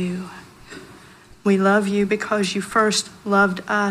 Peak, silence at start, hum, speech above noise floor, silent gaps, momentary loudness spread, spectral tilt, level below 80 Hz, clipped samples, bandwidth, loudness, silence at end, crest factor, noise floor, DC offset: -4 dBFS; 0 s; none; 27 dB; none; 22 LU; -4.5 dB/octave; -56 dBFS; under 0.1%; 14 kHz; -20 LUFS; 0 s; 16 dB; -46 dBFS; under 0.1%